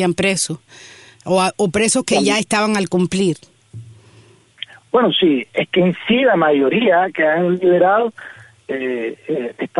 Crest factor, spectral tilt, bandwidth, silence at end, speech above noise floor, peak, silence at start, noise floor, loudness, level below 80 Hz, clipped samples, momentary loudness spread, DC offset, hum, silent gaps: 16 dB; -4.5 dB/octave; 11.5 kHz; 0 s; 32 dB; -2 dBFS; 0 s; -48 dBFS; -16 LUFS; -56 dBFS; under 0.1%; 14 LU; under 0.1%; none; none